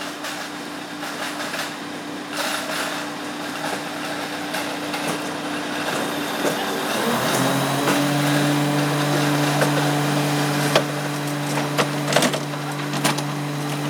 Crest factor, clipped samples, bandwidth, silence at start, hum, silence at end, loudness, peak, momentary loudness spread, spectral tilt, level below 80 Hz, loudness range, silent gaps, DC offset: 22 dB; under 0.1%; over 20 kHz; 0 s; none; 0 s; -22 LUFS; -2 dBFS; 9 LU; -4 dB/octave; -70 dBFS; 7 LU; none; under 0.1%